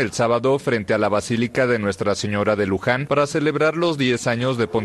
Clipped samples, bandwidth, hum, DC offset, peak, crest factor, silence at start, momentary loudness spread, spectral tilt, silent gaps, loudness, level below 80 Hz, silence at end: under 0.1%; 12.5 kHz; none; under 0.1%; -4 dBFS; 16 dB; 0 s; 2 LU; -5.5 dB/octave; none; -20 LUFS; -52 dBFS; 0 s